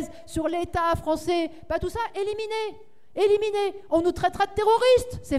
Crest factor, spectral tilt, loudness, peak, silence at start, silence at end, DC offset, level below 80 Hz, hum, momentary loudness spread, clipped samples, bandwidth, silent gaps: 16 dB; -5 dB/octave; -25 LUFS; -10 dBFS; 0 s; 0 s; 0.6%; -46 dBFS; none; 9 LU; under 0.1%; 15 kHz; none